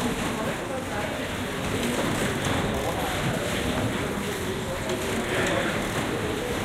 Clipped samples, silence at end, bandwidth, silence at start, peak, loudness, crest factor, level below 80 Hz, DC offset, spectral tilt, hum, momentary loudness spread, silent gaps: under 0.1%; 0 s; 16 kHz; 0 s; -14 dBFS; -27 LUFS; 14 dB; -42 dBFS; under 0.1%; -4.5 dB/octave; none; 4 LU; none